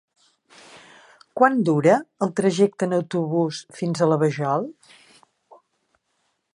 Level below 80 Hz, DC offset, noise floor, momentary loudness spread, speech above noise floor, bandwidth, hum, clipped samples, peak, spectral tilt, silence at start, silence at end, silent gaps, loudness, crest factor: -72 dBFS; under 0.1%; -72 dBFS; 9 LU; 51 dB; 11 kHz; none; under 0.1%; -2 dBFS; -6.5 dB/octave; 0.75 s; 1.8 s; none; -21 LUFS; 20 dB